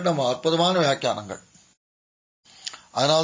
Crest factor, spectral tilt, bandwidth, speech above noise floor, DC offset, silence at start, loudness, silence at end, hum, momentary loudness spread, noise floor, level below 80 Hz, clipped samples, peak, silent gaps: 18 dB; -4.5 dB/octave; 7.8 kHz; over 68 dB; under 0.1%; 0 s; -23 LUFS; 0 s; none; 17 LU; under -90 dBFS; -66 dBFS; under 0.1%; -6 dBFS; 1.77-2.43 s